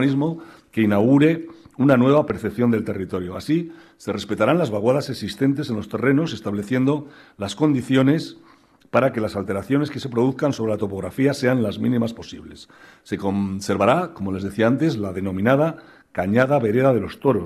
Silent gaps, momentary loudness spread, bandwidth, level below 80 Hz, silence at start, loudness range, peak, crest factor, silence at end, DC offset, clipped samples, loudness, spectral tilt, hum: none; 11 LU; 14 kHz; -56 dBFS; 0 s; 3 LU; -6 dBFS; 16 dB; 0 s; under 0.1%; under 0.1%; -21 LUFS; -7 dB/octave; none